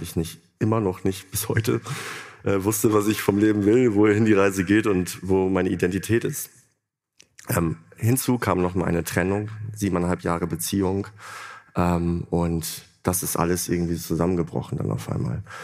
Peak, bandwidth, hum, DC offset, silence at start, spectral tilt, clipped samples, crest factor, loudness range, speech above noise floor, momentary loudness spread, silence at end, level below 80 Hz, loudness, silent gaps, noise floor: -4 dBFS; 15.5 kHz; none; under 0.1%; 0 s; -5.5 dB/octave; under 0.1%; 20 dB; 5 LU; 52 dB; 11 LU; 0 s; -48 dBFS; -23 LUFS; none; -75 dBFS